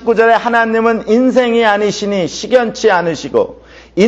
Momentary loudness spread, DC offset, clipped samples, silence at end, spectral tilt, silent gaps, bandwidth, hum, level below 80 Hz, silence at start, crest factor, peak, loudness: 6 LU; under 0.1%; under 0.1%; 0 s; -4.5 dB/octave; none; 8 kHz; none; -48 dBFS; 0 s; 12 dB; 0 dBFS; -13 LUFS